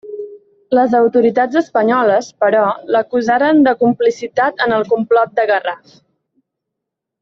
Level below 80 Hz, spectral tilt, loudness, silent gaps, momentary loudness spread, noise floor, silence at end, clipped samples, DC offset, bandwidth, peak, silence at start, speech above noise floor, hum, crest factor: -60 dBFS; -5.5 dB/octave; -14 LUFS; none; 6 LU; -80 dBFS; 1.45 s; under 0.1%; under 0.1%; 7.4 kHz; -2 dBFS; 0.05 s; 66 dB; none; 12 dB